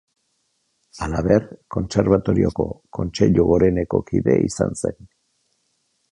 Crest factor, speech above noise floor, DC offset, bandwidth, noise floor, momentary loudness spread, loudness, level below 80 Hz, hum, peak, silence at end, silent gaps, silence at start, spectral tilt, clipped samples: 18 dB; 50 dB; under 0.1%; 11 kHz; -69 dBFS; 11 LU; -20 LUFS; -38 dBFS; none; -2 dBFS; 1.2 s; none; 0.95 s; -7 dB/octave; under 0.1%